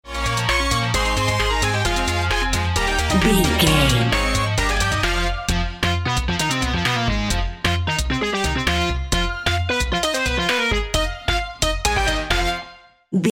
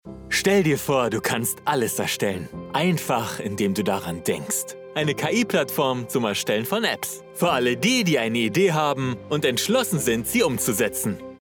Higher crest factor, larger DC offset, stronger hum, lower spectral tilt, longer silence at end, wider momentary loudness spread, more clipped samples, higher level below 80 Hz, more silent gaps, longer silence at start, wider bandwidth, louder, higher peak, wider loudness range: about the same, 18 dB vs 16 dB; neither; neither; about the same, -4 dB/octave vs -4 dB/octave; about the same, 0 s vs 0.05 s; about the same, 5 LU vs 7 LU; neither; first, -26 dBFS vs -56 dBFS; neither; about the same, 0.05 s vs 0.05 s; second, 16.5 kHz vs over 20 kHz; first, -20 LUFS vs -23 LUFS; first, -2 dBFS vs -6 dBFS; about the same, 3 LU vs 3 LU